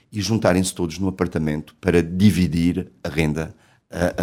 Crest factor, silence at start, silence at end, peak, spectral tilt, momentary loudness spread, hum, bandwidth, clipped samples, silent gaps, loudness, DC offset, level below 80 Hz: 18 dB; 0.1 s; 0 s; -2 dBFS; -6 dB/octave; 10 LU; none; 16.5 kHz; under 0.1%; none; -21 LUFS; under 0.1%; -40 dBFS